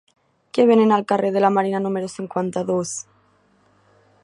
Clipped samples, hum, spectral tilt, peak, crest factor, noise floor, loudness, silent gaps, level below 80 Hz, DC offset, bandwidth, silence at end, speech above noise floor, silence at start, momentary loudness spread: under 0.1%; none; -5.5 dB/octave; -4 dBFS; 18 dB; -59 dBFS; -20 LUFS; none; -68 dBFS; under 0.1%; 11.5 kHz; 1.2 s; 40 dB; 0.55 s; 12 LU